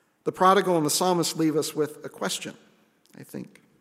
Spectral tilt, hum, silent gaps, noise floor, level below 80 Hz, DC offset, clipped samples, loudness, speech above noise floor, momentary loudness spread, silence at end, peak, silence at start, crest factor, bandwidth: -4 dB/octave; none; none; -59 dBFS; -76 dBFS; under 0.1%; under 0.1%; -24 LUFS; 34 dB; 20 LU; 0.35 s; -6 dBFS; 0.25 s; 20 dB; 16 kHz